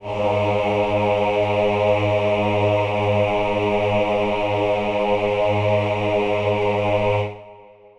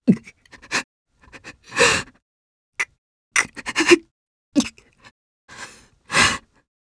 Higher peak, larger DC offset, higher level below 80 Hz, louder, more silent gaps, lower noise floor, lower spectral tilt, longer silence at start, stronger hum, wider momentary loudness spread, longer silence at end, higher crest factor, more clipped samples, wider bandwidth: second, -6 dBFS vs 0 dBFS; neither; first, -44 dBFS vs -52 dBFS; about the same, -20 LUFS vs -20 LUFS; second, none vs 0.84-1.06 s, 2.22-2.72 s, 2.98-3.31 s, 4.11-4.52 s, 5.11-5.48 s; about the same, -45 dBFS vs -47 dBFS; first, -7 dB/octave vs -3 dB/octave; about the same, 0 s vs 0.05 s; neither; second, 2 LU vs 23 LU; about the same, 0.35 s vs 0.45 s; second, 12 dB vs 24 dB; neither; about the same, 10.5 kHz vs 11 kHz